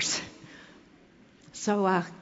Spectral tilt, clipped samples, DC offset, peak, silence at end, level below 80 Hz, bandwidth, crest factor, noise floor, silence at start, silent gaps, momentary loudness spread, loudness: -3.5 dB/octave; under 0.1%; under 0.1%; -14 dBFS; 0 s; -68 dBFS; 8 kHz; 18 dB; -57 dBFS; 0 s; none; 23 LU; -28 LUFS